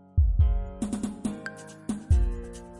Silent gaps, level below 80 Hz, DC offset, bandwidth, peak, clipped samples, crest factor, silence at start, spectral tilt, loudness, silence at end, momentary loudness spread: none; -28 dBFS; under 0.1%; 11.5 kHz; -12 dBFS; under 0.1%; 14 dB; 0.15 s; -7.5 dB/octave; -29 LUFS; 0 s; 15 LU